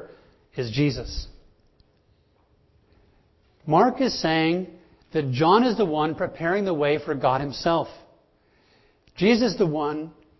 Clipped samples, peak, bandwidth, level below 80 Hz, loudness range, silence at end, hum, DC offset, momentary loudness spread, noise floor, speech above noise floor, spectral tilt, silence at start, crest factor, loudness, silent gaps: under 0.1%; -4 dBFS; 6.2 kHz; -48 dBFS; 9 LU; 0.3 s; none; under 0.1%; 15 LU; -63 dBFS; 40 dB; -6.5 dB/octave; 0 s; 20 dB; -23 LUFS; none